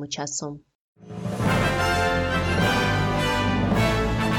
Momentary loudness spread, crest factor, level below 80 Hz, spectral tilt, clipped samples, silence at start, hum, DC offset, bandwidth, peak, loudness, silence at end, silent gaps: 11 LU; 12 dB; -36 dBFS; -5 dB/octave; under 0.1%; 0 s; none; under 0.1%; 17.5 kHz; -10 dBFS; -23 LUFS; 0 s; 0.75-0.95 s